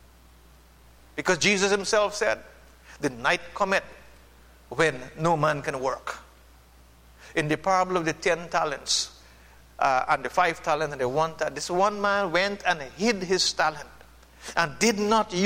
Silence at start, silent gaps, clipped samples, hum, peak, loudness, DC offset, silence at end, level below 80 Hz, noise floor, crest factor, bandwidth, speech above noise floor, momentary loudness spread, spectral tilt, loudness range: 1.15 s; none; under 0.1%; none; -6 dBFS; -25 LUFS; under 0.1%; 0 s; -54 dBFS; -54 dBFS; 22 dB; 16.5 kHz; 28 dB; 9 LU; -3 dB/octave; 3 LU